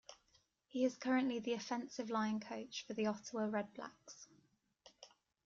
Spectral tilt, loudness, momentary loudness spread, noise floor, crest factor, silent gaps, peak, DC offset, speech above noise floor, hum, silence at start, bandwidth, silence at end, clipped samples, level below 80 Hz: -4.5 dB/octave; -41 LUFS; 23 LU; -76 dBFS; 18 dB; none; -24 dBFS; under 0.1%; 36 dB; none; 0.1 s; 7.6 kHz; 0.4 s; under 0.1%; -84 dBFS